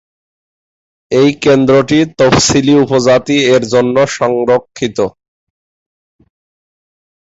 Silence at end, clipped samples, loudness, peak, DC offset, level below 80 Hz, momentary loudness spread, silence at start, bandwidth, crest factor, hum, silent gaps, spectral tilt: 2.1 s; under 0.1%; -11 LUFS; 0 dBFS; under 0.1%; -42 dBFS; 7 LU; 1.1 s; 8 kHz; 12 dB; none; none; -4.5 dB/octave